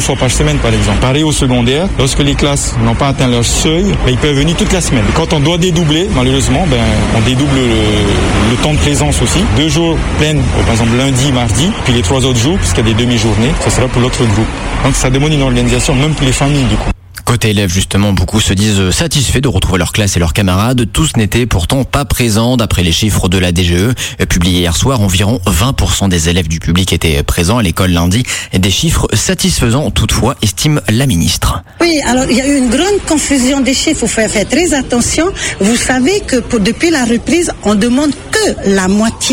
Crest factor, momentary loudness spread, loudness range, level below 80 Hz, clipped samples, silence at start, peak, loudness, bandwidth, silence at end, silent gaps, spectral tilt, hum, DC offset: 10 dB; 2 LU; 1 LU; -20 dBFS; under 0.1%; 0 s; 0 dBFS; -11 LUFS; 16.5 kHz; 0 s; none; -4.5 dB/octave; none; under 0.1%